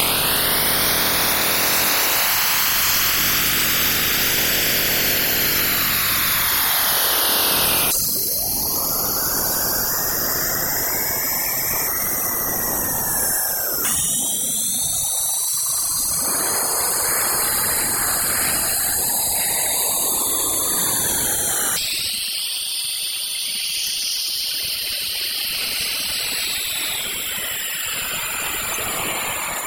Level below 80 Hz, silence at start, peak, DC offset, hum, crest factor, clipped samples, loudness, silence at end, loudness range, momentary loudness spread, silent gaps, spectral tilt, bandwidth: -44 dBFS; 0 s; 0 dBFS; under 0.1%; none; 20 dB; under 0.1%; -18 LUFS; 0 s; 5 LU; 6 LU; none; -0.5 dB/octave; 17 kHz